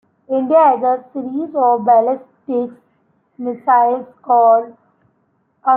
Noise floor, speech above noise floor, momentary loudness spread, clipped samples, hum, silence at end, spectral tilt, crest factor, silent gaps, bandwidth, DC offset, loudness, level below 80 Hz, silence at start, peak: -63 dBFS; 48 dB; 13 LU; under 0.1%; none; 0 s; -10.5 dB/octave; 14 dB; none; 3.6 kHz; under 0.1%; -15 LUFS; -74 dBFS; 0.3 s; -2 dBFS